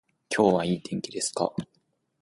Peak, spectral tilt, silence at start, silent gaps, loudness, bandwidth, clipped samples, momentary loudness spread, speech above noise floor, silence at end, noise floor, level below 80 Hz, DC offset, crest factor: -6 dBFS; -4.5 dB/octave; 0.3 s; none; -27 LUFS; 11.5 kHz; under 0.1%; 10 LU; 46 dB; 0.6 s; -72 dBFS; -62 dBFS; under 0.1%; 22 dB